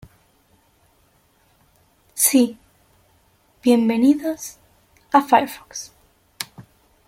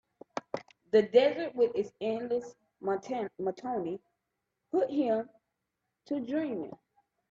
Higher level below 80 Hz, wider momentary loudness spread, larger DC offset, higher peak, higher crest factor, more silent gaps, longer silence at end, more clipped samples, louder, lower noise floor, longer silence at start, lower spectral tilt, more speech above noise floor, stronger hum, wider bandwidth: first, -62 dBFS vs -76 dBFS; about the same, 18 LU vs 17 LU; neither; first, -2 dBFS vs -10 dBFS; about the same, 20 dB vs 22 dB; neither; about the same, 0.45 s vs 0.55 s; neither; first, -18 LUFS vs -31 LUFS; second, -60 dBFS vs -85 dBFS; first, 2.15 s vs 0.35 s; second, -3 dB/octave vs -6 dB/octave; second, 42 dB vs 55 dB; neither; first, 16.5 kHz vs 7.6 kHz